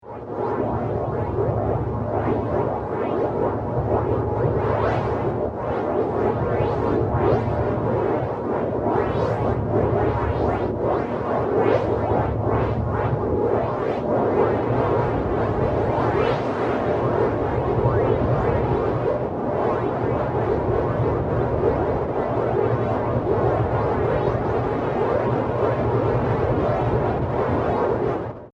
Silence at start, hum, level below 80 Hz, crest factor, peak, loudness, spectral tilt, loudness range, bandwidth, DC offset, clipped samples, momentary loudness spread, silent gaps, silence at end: 0.05 s; none; -36 dBFS; 14 dB; -8 dBFS; -22 LUFS; -9.5 dB/octave; 1 LU; 6.8 kHz; under 0.1%; under 0.1%; 4 LU; none; 0.05 s